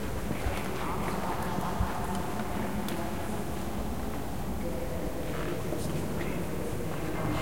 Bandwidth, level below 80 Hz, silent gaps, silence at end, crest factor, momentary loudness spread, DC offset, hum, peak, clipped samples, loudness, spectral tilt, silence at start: 16.5 kHz; -42 dBFS; none; 0 s; 18 dB; 3 LU; 2%; none; -16 dBFS; under 0.1%; -34 LUFS; -5.5 dB/octave; 0 s